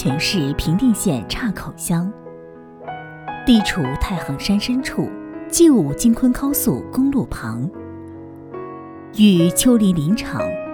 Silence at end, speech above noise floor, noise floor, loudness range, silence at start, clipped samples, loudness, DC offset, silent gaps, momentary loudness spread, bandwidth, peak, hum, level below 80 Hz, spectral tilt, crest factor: 0 s; 21 dB; -39 dBFS; 4 LU; 0 s; under 0.1%; -18 LUFS; under 0.1%; none; 20 LU; over 20 kHz; -2 dBFS; none; -36 dBFS; -5 dB/octave; 16 dB